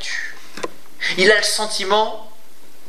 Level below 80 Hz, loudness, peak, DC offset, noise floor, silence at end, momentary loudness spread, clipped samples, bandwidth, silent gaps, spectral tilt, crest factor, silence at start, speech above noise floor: -72 dBFS; -17 LUFS; 0 dBFS; 5%; -49 dBFS; 0.6 s; 18 LU; under 0.1%; 15 kHz; none; -1.5 dB/octave; 20 dB; 0 s; 32 dB